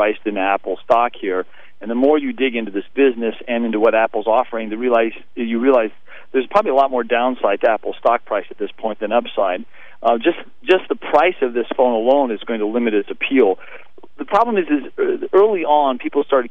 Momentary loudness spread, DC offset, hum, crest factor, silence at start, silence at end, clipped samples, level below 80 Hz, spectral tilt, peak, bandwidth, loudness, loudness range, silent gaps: 9 LU; 2%; none; 16 dB; 0 s; 0.05 s; under 0.1%; -64 dBFS; -6.5 dB/octave; -2 dBFS; 6.4 kHz; -18 LUFS; 2 LU; none